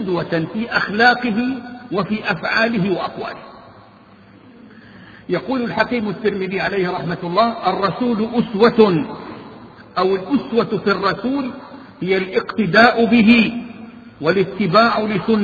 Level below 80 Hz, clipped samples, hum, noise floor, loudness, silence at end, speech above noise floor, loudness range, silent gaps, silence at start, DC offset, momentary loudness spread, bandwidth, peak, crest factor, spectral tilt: -52 dBFS; under 0.1%; none; -45 dBFS; -17 LUFS; 0 s; 28 dB; 8 LU; none; 0 s; under 0.1%; 17 LU; 7 kHz; 0 dBFS; 18 dB; -7.5 dB/octave